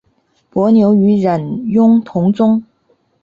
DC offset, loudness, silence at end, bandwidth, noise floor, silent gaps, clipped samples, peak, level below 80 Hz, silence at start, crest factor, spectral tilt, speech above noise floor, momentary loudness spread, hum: under 0.1%; -13 LUFS; 0.6 s; 5 kHz; -59 dBFS; none; under 0.1%; -2 dBFS; -54 dBFS; 0.55 s; 10 dB; -10 dB/octave; 48 dB; 8 LU; none